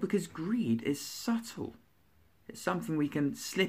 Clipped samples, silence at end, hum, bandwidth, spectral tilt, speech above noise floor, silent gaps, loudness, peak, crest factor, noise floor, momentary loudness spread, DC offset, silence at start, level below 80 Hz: under 0.1%; 0 s; none; 15.5 kHz; -5 dB/octave; 35 dB; none; -34 LUFS; -14 dBFS; 20 dB; -68 dBFS; 11 LU; under 0.1%; 0 s; -70 dBFS